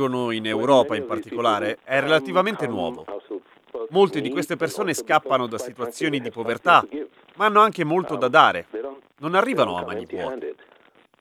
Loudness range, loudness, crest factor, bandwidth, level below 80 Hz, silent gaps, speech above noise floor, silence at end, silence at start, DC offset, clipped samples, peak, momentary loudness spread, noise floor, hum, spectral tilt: 4 LU; -21 LUFS; 22 dB; 15.5 kHz; -66 dBFS; none; 34 dB; 0.7 s; 0 s; under 0.1%; under 0.1%; 0 dBFS; 17 LU; -56 dBFS; none; -4.5 dB/octave